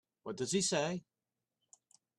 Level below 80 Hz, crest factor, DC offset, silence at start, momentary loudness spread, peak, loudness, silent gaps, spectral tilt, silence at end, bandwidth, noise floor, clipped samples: -78 dBFS; 20 dB; under 0.1%; 0.25 s; 13 LU; -20 dBFS; -35 LUFS; none; -3.5 dB/octave; 1.2 s; 13 kHz; under -90 dBFS; under 0.1%